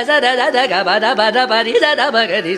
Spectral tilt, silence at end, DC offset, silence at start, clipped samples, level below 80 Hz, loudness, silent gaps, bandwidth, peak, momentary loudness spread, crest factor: -3 dB/octave; 0 s; under 0.1%; 0 s; under 0.1%; -66 dBFS; -13 LUFS; none; 14 kHz; 0 dBFS; 1 LU; 14 dB